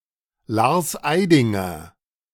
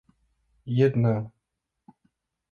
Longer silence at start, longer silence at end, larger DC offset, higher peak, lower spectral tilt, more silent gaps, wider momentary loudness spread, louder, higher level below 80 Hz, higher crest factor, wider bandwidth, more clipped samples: second, 0.5 s vs 0.65 s; second, 0.45 s vs 1.25 s; neither; first, -2 dBFS vs -10 dBFS; second, -5.5 dB/octave vs -10 dB/octave; neither; second, 12 LU vs 20 LU; first, -20 LUFS vs -25 LUFS; first, -54 dBFS vs -62 dBFS; about the same, 18 dB vs 20 dB; first, 18 kHz vs 6.6 kHz; neither